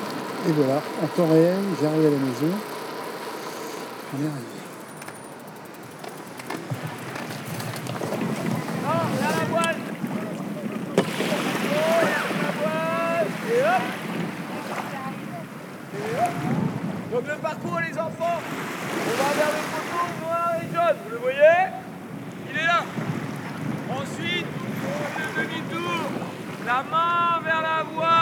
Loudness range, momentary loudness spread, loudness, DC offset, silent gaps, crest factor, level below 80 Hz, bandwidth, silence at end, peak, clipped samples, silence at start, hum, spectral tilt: 10 LU; 14 LU; -25 LUFS; under 0.1%; none; 20 dB; -70 dBFS; over 20 kHz; 0 s; -4 dBFS; under 0.1%; 0 s; none; -5.5 dB/octave